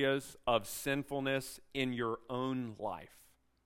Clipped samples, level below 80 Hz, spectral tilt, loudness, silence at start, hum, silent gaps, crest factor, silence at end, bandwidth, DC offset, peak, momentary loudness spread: under 0.1%; -64 dBFS; -4.5 dB/octave; -37 LUFS; 0 s; none; none; 22 dB; 0.6 s; 16 kHz; under 0.1%; -16 dBFS; 8 LU